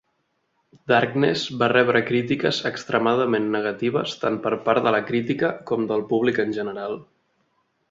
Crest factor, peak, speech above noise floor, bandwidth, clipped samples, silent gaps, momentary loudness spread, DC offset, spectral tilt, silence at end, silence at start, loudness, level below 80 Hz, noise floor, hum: 20 dB; -2 dBFS; 50 dB; 7.8 kHz; under 0.1%; none; 7 LU; under 0.1%; -6 dB/octave; 0.9 s; 0.85 s; -22 LUFS; -62 dBFS; -71 dBFS; none